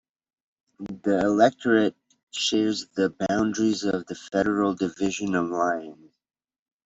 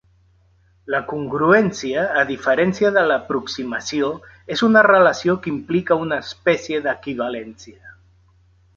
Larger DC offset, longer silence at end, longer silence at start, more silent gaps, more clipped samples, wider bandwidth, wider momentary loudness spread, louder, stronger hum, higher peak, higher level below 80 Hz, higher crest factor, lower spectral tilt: neither; about the same, 0.95 s vs 0.85 s; about the same, 0.8 s vs 0.85 s; first, 2.23-2.27 s vs none; neither; about the same, 8 kHz vs 7.6 kHz; about the same, 10 LU vs 12 LU; second, -24 LUFS vs -19 LUFS; neither; second, -6 dBFS vs -2 dBFS; second, -62 dBFS vs -54 dBFS; about the same, 20 dB vs 18 dB; about the same, -4.5 dB/octave vs -5 dB/octave